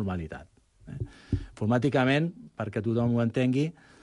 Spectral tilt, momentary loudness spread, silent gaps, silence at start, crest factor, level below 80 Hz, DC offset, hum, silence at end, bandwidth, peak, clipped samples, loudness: -7.5 dB/octave; 15 LU; none; 0 s; 16 dB; -46 dBFS; under 0.1%; none; 0.3 s; 11 kHz; -12 dBFS; under 0.1%; -28 LUFS